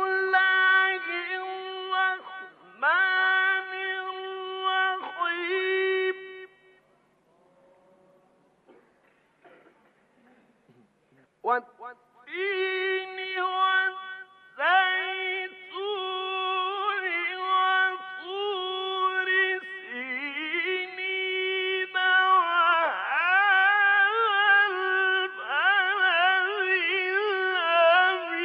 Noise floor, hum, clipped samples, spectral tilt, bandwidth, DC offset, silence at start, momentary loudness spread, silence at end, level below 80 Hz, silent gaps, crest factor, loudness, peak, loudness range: -65 dBFS; none; under 0.1%; -3 dB/octave; 5.6 kHz; under 0.1%; 0 s; 15 LU; 0 s; -88 dBFS; none; 18 dB; -24 LUFS; -10 dBFS; 10 LU